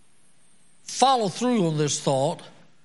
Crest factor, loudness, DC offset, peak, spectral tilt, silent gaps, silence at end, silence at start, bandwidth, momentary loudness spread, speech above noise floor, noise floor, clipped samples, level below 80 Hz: 22 dB; -23 LUFS; 0.3%; -4 dBFS; -4.5 dB/octave; none; 0.35 s; 0.9 s; 11.5 kHz; 14 LU; 40 dB; -62 dBFS; under 0.1%; -70 dBFS